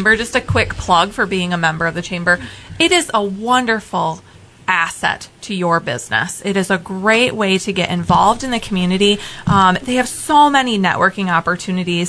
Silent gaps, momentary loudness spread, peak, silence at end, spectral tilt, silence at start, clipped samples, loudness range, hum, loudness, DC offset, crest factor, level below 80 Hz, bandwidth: none; 7 LU; 0 dBFS; 0 s; -4 dB/octave; 0 s; under 0.1%; 4 LU; none; -16 LUFS; under 0.1%; 16 dB; -40 dBFS; 11 kHz